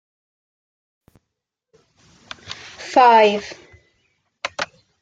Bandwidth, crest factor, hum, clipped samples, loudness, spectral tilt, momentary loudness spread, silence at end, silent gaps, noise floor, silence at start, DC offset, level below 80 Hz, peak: 9 kHz; 20 dB; none; under 0.1%; -17 LUFS; -3.5 dB/octave; 24 LU; 0.35 s; none; -80 dBFS; 2.5 s; under 0.1%; -66 dBFS; -2 dBFS